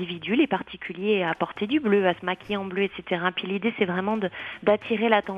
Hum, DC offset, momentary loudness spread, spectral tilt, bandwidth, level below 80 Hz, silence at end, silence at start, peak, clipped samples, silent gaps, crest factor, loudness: none; under 0.1%; 7 LU; -7.5 dB/octave; 5.6 kHz; -64 dBFS; 0 s; 0 s; -4 dBFS; under 0.1%; none; 22 dB; -25 LUFS